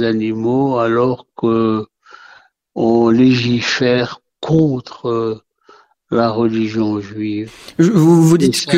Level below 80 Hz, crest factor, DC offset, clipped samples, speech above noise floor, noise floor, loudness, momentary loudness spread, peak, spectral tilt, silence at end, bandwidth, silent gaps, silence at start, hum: -50 dBFS; 14 dB; under 0.1%; under 0.1%; 34 dB; -49 dBFS; -15 LUFS; 12 LU; 0 dBFS; -6 dB/octave; 0 s; 15.5 kHz; none; 0 s; none